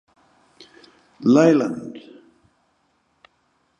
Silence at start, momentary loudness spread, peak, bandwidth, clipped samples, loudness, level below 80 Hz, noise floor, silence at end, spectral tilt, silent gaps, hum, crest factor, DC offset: 1.2 s; 23 LU; -2 dBFS; 9.4 kHz; under 0.1%; -18 LUFS; -70 dBFS; -66 dBFS; 1.8 s; -7 dB/octave; none; none; 22 dB; under 0.1%